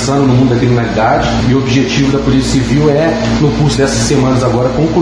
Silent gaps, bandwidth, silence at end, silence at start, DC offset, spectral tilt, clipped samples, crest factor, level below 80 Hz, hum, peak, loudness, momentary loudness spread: none; 10.5 kHz; 0 s; 0 s; under 0.1%; -6 dB/octave; under 0.1%; 10 dB; -26 dBFS; none; 0 dBFS; -11 LUFS; 2 LU